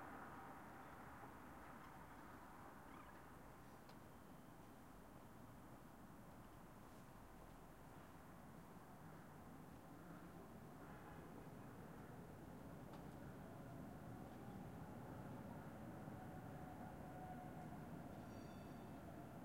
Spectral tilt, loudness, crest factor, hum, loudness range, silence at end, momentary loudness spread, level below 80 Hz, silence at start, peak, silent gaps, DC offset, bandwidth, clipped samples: -6.5 dB/octave; -58 LUFS; 18 dB; none; 6 LU; 0 s; 7 LU; -70 dBFS; 0 s; -40 dBFS; none; under 0.1%; 16 kHz; under 0.1%